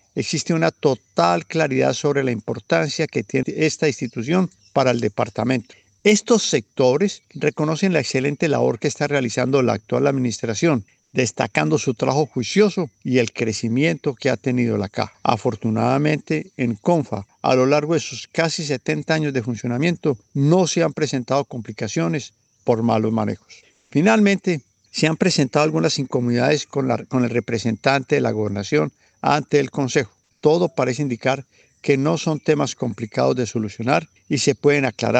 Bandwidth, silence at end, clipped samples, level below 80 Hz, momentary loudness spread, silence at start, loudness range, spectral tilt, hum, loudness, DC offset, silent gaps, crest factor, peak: 9.2 kHz; 0 s; under 0.1%; -62 dBFS; 7 LU; 0.15 s; 2 LU; -5.5 dB/octave; none; -20 LUFS; under 0.1%; none; 20 dB; 0 dBFS